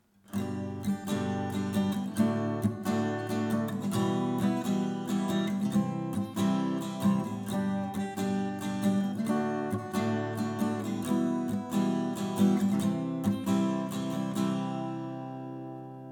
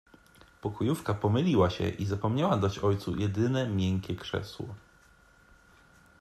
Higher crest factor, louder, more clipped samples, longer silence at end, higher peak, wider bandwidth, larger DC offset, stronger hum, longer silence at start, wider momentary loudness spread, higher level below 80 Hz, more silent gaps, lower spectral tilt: about the same, 16 dB vs 18 dB; about the same, -31 LUFS vs -30 LUFS; neither; second, 0 s vs 1.45 s; about the same, -14 dBFS vs -12 dBFS; first, 18.5 kHz vs 13.5 kHz; neither; neither; second, 0.3 s vs 0.65 s; second, 6 LU vs 13 LU; second, -68 dBFS vs -58 dBFS; neither; about the same, -6.5 dB/octave vs -7 dB/octave